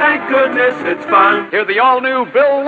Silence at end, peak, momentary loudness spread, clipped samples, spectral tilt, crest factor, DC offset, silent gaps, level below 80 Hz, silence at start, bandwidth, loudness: 0 s; 0 dBFS; 5 LU; under 0.1%; -5.5 dB/octave; 12 dB; under 0.1%; none; -66 dBFS; 0 s; 7.2 kHz; -12 LUFS